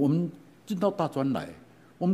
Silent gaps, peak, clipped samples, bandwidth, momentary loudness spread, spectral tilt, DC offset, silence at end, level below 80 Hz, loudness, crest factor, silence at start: none; -12 dBFS; under 0.1%; 15 kHz; 13 LU; -8.5 dB/octave; under 0.1%; 0 s; -68 dBFS; -30 LUFS; 16 dB; 0 s